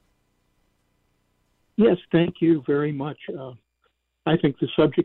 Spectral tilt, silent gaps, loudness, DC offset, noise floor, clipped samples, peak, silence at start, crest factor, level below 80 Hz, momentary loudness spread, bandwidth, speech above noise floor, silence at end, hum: -10.5 dB/octave; none; -23 LUFS; under 0.1%; -71 dBFS; under 0.1%; -8 dBFS; 1.8 s; 16 dB; -58 dBFS; 15 LU; 4.2 kHz; 49 dB; 0 s; none